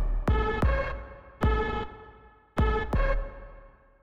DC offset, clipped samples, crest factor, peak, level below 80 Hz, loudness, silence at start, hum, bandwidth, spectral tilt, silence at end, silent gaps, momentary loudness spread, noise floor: under 0.1%; under 0.1%; 14 dB; -14 dBFS; -30 dBFS; -29 LUFS; 0 s; none; 7 kHz; -8 dB/octave; 0.35 s; none; 19 LU; -53 dBFS